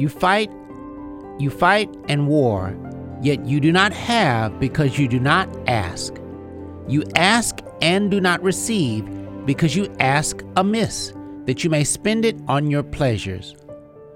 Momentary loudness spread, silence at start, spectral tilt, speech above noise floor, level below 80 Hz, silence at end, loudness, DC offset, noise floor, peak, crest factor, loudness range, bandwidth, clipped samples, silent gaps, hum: 16 LU; 0 s; -5 dB/octave; 21 dB; -46 dBFS; 0 s; -20 LUFS; under 0.1%; -40 dBFS; 0 dBFS; 20 dB; 2 LU; 16.5 kHz; under 0.1%; none; none